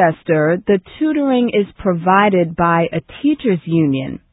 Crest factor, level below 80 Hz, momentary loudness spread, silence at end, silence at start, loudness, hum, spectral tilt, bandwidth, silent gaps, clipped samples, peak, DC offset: 14 dB; -46 dBFS; 6 LU; 0.15 s; 0 s; -16 LUFS; none; -12.5 dB/octave; 4 kHz; none; under 0.1%; 0 dBFS; under 0.1%